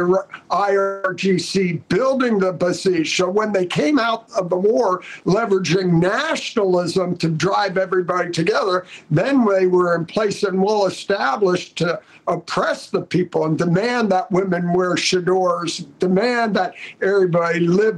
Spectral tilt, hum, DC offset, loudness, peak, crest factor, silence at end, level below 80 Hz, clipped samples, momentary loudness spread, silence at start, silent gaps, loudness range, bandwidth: -5.5 dB/octave; none; under 0.1%; -19 LUFS; -8 dBFS; 10 dB; 0 s; -60 dBFS; under 0.1%; 5 LU; 0 s; none; 2 LU; 11.5 kHz